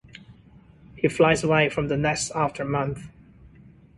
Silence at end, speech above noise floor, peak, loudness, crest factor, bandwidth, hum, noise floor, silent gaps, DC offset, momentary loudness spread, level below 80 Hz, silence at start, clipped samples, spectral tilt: 0.9 s; 29 dB; -6 dBFS; -23 LUFS; 20 dB; 11.5 kHz; none; -52 dBFS; none; under 0.1%; 8 LU; -50 dBFS; 0.3 s; under 0.1%; -5 dB/octave